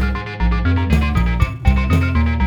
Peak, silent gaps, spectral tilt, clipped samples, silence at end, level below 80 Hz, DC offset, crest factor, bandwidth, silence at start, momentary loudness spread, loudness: -2 dBFS; none; -7.5 dB/octave; under 0.1%; 0 s; -18 dBFS; under 0.1%; 14 dB; 14 kHz; 0 s; 4 LU; -18 LUFS